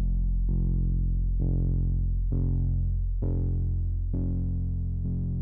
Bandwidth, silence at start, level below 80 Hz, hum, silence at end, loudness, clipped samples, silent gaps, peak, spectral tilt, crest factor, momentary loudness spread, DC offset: 1.1 kHz; 0 s; -28 dBFS; none; 0 s; -29 LUFS; under 0.1%; none; -16 dBFS; -14.5 dB/octave; 8 dB; 3 LU; under 0.1%